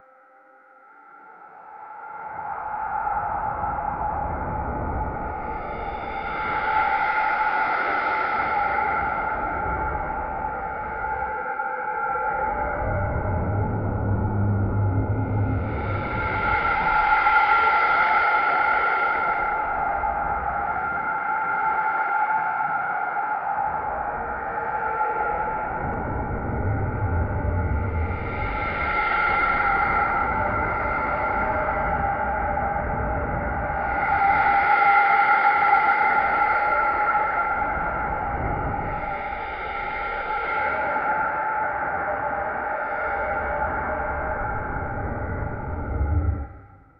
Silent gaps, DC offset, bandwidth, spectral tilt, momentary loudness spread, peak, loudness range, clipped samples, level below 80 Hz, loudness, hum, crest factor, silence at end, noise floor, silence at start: none; under 0.1%; 5.6 kHz; -9 dB/octave; 10 LU; -6 dBFS; 8 LU; under 0.1%; -36 dBFS; -23 LUFS; none; 18 dB; 0.2 s; -53 dBFS; 1.05 s